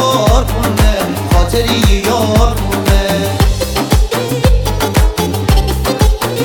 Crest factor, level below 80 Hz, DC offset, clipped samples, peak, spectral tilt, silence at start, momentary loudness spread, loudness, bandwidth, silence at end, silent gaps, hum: 12 dB; -14 dBFS; under 0.1%; under 0.1%; 0 dBFS; -5 dB/octave; 0 s; 3 LU; -13 LUFS; 19 kHz; 0 s; none; none